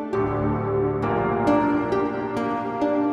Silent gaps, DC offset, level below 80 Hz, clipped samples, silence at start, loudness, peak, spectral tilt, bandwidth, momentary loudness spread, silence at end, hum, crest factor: none; under 0.1%; -44 dBFS; under 0.1%; 0 s; -23 LUFS; -8 dBFS; -8.5 dB/octave; 8.4 kHz; 5 LU; 0 s; none; 16 dB